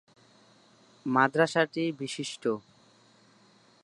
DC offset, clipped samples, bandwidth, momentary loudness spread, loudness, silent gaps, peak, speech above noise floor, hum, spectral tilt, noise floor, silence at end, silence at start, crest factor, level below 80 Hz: under 0.1%; under 0.1%; 11.5 kHz; 11 LU; -28 LUFS; none; -8 dBFS; 33 dB; none; -5 dB/octave; -61 dBFS; 1.25 s; 1.05 s; 24 dB; -80 dBFS